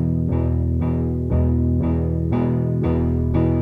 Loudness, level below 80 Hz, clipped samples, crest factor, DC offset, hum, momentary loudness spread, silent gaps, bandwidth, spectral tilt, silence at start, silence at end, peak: -21 LUFS; -28 dBFS; under 0.1%; 12 dB; under 0.1%; none; 2 LU; none; 3.6 kHz; -12 dB/octave; 0 s; 0 s; -8 dBFS